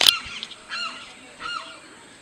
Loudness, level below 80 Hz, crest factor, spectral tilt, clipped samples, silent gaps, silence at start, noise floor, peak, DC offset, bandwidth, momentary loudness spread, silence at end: -27 LUFS; -60 dBFS; 26 dB; 1 dB/octave; under 0.1%; none; 0 s; -45 dBFS; 0 dBFS; under 0.1%; 13 kHz; 15 LU; 0 s